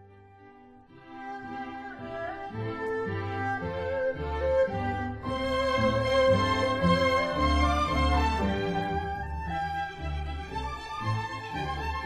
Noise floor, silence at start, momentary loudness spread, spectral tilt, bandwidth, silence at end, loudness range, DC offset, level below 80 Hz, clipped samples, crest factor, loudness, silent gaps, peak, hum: -53 dBFS; 0 s; 13 LU; -6 dB/octave; 14 kHz; 0 s; 9 LU; under 0.1%; -38 dBFS; under 0.1%; 18 dB; -29 LUFS; none; -12 dBFS; none